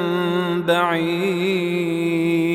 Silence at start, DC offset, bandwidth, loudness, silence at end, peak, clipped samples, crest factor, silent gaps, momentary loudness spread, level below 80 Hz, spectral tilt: 0 s; under 0.1%; 15.5 kHz; -20 LUFS; 0 s; -6 dBFS; under 0.1%; 14 dB; none; 3 LU; -62 dBFS; -6.5 dB/octave